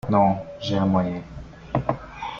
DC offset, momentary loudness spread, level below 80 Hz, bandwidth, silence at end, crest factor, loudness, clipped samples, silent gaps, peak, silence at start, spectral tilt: under 0.1%; 15 LU; -46 dBFS; 7 kHz; 0 s; 18 dB; -24 LUFS; under 0.1%; none; -6 dBFS; 0.05 s; -8 dB/octave